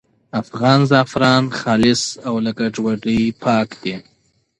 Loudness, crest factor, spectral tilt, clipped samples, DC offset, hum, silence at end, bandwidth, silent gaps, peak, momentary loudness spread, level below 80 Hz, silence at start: -17 LUFS; 16 dB; -5.5 dB/octave; under 0.1%; under 0.1%; none; 0.6 s; 11 kHz; none; 0 dBFS; 12 LU; -50 dBFS; 0.35 s